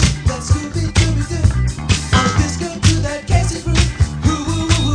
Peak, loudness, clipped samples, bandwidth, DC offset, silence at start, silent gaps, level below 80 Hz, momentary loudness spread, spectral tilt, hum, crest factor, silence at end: 0 dBFS; -17 LUFS; under 0.1%; 10 kHz; under 0.1%; 0 s; none; -22 dBFS; 4 LU; -4.5 dB/octave; none; 16 dB; 0 s